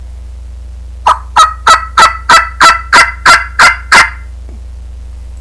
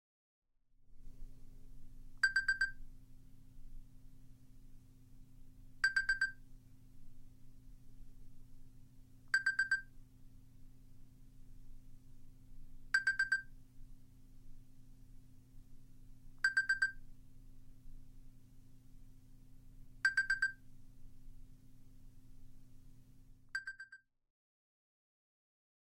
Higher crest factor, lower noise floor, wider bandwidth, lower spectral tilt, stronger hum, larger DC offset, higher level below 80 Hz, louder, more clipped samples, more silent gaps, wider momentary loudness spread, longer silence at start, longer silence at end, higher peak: second, 10 dB vs 24 dB; second, -25 dBFS vs -65 dBFS; second, 11 kHz vs 16 kHz; about the same, -1 dB/octave vs -1 dB/octave; neither; first, 0.6% vs under 0.1%; first, -26 dBFS vs -56 dBFS; first, -6 LUFS vs -36 LUFS; first, 2% vs under 0.1%; neither; second, 8 LU vs 28 LU; second, 0 s vs 0.8 s; second, 0 s vs 1.9 s; first, 0 dBFS vs -18 dBFS